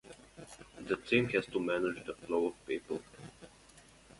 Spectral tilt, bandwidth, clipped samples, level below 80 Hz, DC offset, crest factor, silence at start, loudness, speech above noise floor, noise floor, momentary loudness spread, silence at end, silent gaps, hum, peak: -5.5 dB/octave; 11.5 kHz; under 0.1%; -66 dBFS; under 0.1%; 22 dB; 0.05 s; -35 LUFS; 26 dB; -60 dBFS; 23 LU; 0.4 s; none; none; -14 dBFS